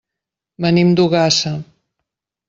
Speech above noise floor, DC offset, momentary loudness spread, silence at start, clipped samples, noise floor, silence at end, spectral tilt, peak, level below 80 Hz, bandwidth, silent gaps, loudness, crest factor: 69 dB; under 0.1%; 10 LU; 0.6 s; under 0.1%; -84 dBFS; 0.85 s; -5 dB/octave; -2 dBFS; -54 dBFS; 7.8 kHz; none; -15 LUFS; 16 dB